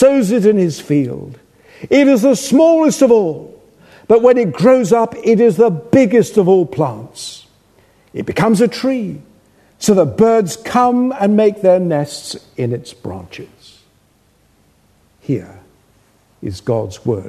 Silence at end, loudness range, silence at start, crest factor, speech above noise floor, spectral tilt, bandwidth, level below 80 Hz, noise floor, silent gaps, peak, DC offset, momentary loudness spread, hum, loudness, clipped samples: 0 s; 15 LU; 0 s; 14 dB; 42 dB; -6 dB/octave; 13.5 kHz; -54 dBFS; -55 dBFS; none; 0 dBFS; under 0.1%; 18 LU; none; -13 LUFS; under 0.1%